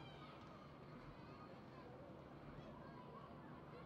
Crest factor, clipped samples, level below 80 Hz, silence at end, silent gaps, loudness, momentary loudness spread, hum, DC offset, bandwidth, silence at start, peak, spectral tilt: 14 dB; under 0.1%; -72 dBFS; 0 s; none; -58 LUFS; 1 LU; none; under 0.1%; 8 kHz; 0 s; -44 dBFS; -5.5 dB/octave